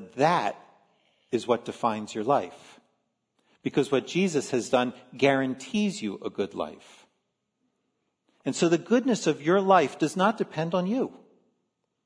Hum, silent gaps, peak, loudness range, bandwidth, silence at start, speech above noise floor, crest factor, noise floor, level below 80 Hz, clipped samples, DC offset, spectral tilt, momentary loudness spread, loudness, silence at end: none; none; -8 dBFS; 6 LU; 11 kHz; 0 s; 52 dB; 20 dB; -78 dBFS; -74 dBFS; under 0.1%; under 0.1%; -5 dB/octave; 10 LU; -26 LUFS; 0.9 s